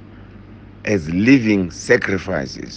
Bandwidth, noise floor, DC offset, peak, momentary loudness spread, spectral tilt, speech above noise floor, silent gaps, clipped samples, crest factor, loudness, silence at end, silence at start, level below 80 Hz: 9 kHz; -40 dBFS; under 0.1%; 0 dBFS; 11 LU; -6 dB/octave; 23 dB; none; under 0.1%; 18 dB; -17 LUFS; 0 s; 0 s; -46 dBFS